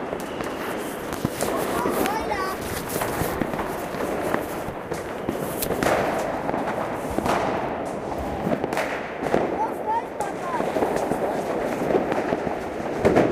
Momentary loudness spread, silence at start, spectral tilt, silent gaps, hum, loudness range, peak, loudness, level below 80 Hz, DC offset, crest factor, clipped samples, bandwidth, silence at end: 6 LU; 0 s; -5 dB/octave; none; none; 2 LU; -4 dBFS; -26 LUFS; -46 dBFS; under 0.1%; 22 dB; under 0.1%; 16 kHz; 0 s